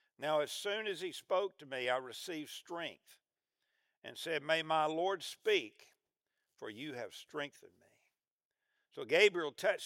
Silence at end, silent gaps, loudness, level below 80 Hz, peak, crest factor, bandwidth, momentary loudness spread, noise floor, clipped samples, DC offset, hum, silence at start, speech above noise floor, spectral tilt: 0 s; 3.97-4.02 s, 8.31-8.39 s, 8.45-8.51 s; -36 LUFS; under -90 dBFS; -14 dBFS; 26 dB; 16.5 kHz; 16 LU; under -90 dBFS; under 0.1%; under 0.1%; none; 0.2 s; over 53 dB; -3 dB/octave